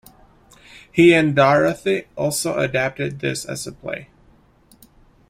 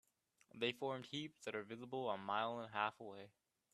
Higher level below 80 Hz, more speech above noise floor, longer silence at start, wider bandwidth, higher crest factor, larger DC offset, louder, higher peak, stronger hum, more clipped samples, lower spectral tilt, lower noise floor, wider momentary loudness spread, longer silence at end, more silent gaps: first, -54 dBFS vs -88 dBFS; first, 35 dB vs 31 dB; first, 0.75 s vs 0.55 s; first, 16 kHz vs 13.5 kHz; about the same, 18 dB vs 22 dB; neither; first, -19 LUFS vs -44 LUFS; first, -2 dBFS vs -24 dBFS; neither; neither; about the same, -5 dB/octave vs -4.5 dB/octave; second, -54 dBFS vs -76 dBFS; about the same, 16 LU vs 14 LU; first, 1.25 s vs 0.45 s; neither